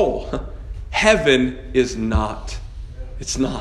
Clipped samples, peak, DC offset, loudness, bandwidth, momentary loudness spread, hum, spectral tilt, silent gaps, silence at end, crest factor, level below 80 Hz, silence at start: under 0.1%; 0 dBFS; under 0.1%; -19 LUFS; 12 kHz; 20 LU; none; -4.5 dB/octave; none; 0 s; 20 dB; -30 dBFS; 0 s